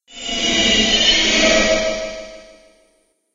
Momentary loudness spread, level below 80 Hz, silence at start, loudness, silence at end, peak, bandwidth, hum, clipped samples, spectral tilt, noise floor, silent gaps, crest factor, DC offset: 14 LU; -36 dBFS; 0.1 s; -14 LUFS; 0.9 s; -2 dBFS; 9.4 kHz; none; under 0.1%; -1.5 dB/octave; -61 dBFS; none; 16 dB; under 0.1%